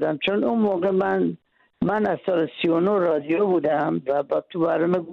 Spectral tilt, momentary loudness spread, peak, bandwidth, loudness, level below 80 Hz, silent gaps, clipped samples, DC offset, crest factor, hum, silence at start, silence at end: -8.5 dB/octave; 4 LU; -12 dBFS; 5.4 kHz; -22 LUFS; -62 dBFS; none; under 0.1%; under 0.1%; 10 dB; none; 0 s; 0 s